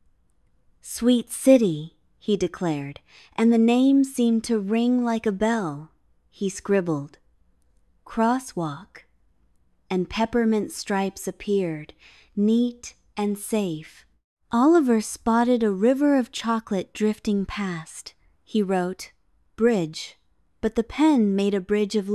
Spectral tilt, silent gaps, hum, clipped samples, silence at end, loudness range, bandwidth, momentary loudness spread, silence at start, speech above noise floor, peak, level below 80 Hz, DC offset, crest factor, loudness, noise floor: -5.5 dB/octave; 14.24-14.37 s; none; under 0.1%; 0 s; 6 LU; 13.5 kHz; 17 LU; 0.85 s; 42 dB; -4 dBFS; -54 dBFS; under 0.1%; 20 dB; -23 LUFS; -65 dBFS